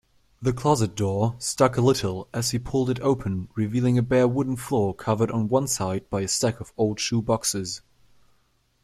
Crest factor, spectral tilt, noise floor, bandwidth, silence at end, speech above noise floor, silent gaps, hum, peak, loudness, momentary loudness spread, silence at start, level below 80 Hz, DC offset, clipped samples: 20 dB; -5.5 dB/octave; -65 dBFS; 15 kHz; 1.05 s; 42 dB; none; none; -6 dBFS; -24 LUFS; 7 LU; 0.4 s; -52 dBFS; under 0.1%; under 0.1%